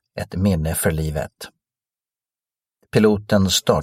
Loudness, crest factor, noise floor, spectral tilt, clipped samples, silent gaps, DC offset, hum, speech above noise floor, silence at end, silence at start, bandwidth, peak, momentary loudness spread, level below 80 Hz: -20 LUFS; 20 dB; under -90 dBFS; -5 dB/octave; under 0.1%; none; under 0.1%; none; over 71 dB; 0 s; 0.15 s; 16.5 kHz; 0 dBFS; 15 LU; -38 dBFS